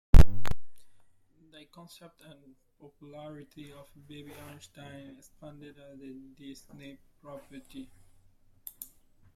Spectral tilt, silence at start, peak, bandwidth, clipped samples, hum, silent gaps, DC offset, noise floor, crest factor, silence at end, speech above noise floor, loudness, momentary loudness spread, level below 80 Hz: -7 dB/octave; 0.15 s; -2 dBFS; 14.5 kHz; under 0.1%; none; none; under 0.1%; -62 dBFS; 24 dB; 8.6 s; 13 dB; -35 LUFS; 13 LU; -32 dBFS